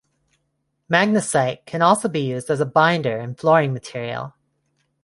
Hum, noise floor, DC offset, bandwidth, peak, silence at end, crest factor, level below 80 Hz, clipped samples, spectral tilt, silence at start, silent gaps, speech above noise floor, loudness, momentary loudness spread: none; -72 dBFS; under 0.1%; 11.5 kHz; -2 dBFS; 0.75 s; 18 dB; -64 dBFS; under 0.1%; -5 dB/octave; 0.9 s; none; 53 dB; -20 LUFS; 11 LU